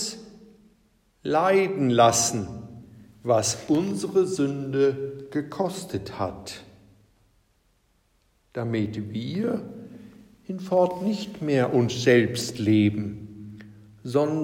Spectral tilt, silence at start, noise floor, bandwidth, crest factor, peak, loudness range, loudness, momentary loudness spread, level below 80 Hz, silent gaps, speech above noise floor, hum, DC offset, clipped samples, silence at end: -5 dB/octave; 0 s; -66 dBFS; 16 kHz; 20 dB; -4 dBFS; 11 LU; -24 LUFS; 21 LU; -62 dBFS; none; 42 dB; none; under 0.1%; under 0.1%; 0 s